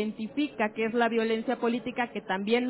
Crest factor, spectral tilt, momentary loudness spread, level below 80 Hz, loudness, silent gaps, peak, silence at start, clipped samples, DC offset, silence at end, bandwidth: 16 dB; -9 dB/octave; 6 LU; -68 dBFS; -29 LUFS; none; -12 dBFS; 0 s; under 0.1%; under 0.1%; 0 s; 4 kHz